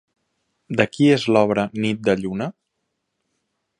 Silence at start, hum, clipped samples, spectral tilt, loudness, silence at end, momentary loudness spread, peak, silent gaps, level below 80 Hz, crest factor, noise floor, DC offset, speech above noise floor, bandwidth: 0.7 s; none; under 0.1%; -6.5 dB/octave; -20 LUFS; 1.3 s; 11 LU; -2 dBFS; none; -58 dBFS; 20 dB; -76 dBFS; under 0.1%; 57 dB; 10.5 kHz